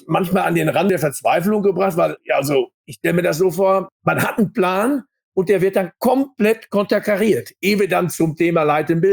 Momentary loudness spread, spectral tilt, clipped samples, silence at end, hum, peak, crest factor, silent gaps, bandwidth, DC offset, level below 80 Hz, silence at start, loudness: 4 LU; -6 dB/octave; under 0.1%; 0 s; none; -4 dBFS; 14 dB; 2.74-2.84 s, 3.92-4.00 s, 5.24-5.32 s; over 20 kHz; under 0.1%; -58 dBFS; 0.05 s; -18 LUFS